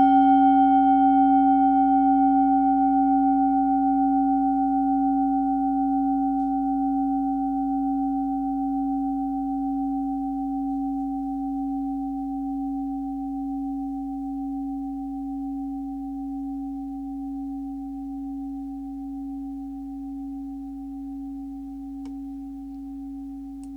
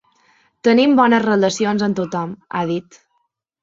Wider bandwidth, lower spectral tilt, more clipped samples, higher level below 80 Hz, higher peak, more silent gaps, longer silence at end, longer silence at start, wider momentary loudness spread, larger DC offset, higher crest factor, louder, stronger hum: second, 3.3 kHz vs 7.8 kHz; first, -8 dB/octave vs -5.5 dB/octave; neither; first, -48 dBFS vs -62 dBFS; second, -10 dBFS vs -2 dBFS; neither; second, 0 s vs 0.8 s; second, 0 s vs 0.65 s; first, 17 LU vs 12 LU; neither; about the same, 14 dB vs 18 dB; second, -24 LUFS vs -17 LUFS; neither